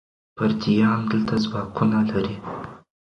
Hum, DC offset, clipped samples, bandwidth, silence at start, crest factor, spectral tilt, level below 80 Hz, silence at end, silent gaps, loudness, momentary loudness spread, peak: none; under 0.1%; under 0.1%; 6.6 kHz; 0.35 s; 16 dB; -7.5 dB/octave; -52 dBFS; 0.3 s; none; -22 LUFS; 14 LU; -6 dBFS